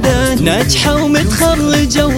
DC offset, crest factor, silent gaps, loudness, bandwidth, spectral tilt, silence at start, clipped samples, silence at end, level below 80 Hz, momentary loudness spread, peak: under 0.1%; 12 dB; none; -11 LUFS; 17 kHz; -4.5 dB/octave; 0 s; under 0.1%; 0 s; -22 dBFS; 1 LU; 0 dBFS